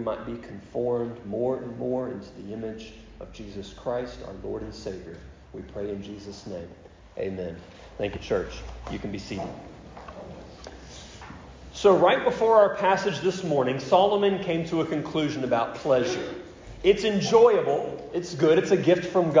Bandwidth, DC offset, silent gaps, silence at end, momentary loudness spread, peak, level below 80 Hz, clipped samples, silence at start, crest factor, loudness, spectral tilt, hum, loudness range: 7.6 kHz; under 0.1%; none; 0 s; 23 LU; -8 dBFS; -50 dBFS; under 0.1%; 0 s; 18 dB; -25 LUFS; -5.5 dB/octave; none; 14 LU